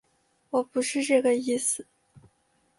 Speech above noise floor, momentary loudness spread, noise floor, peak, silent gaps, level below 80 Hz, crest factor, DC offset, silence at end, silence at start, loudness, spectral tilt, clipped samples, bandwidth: 44 dB; 7 LU; -69 dBFS; -10 dBFS; none; -74 dBFS; 18 dB; under 0.1%; 0.6 s; 0.55 s; -26 LUFS; -2.5 dB/octave; under 0.1%; 11.5 kHz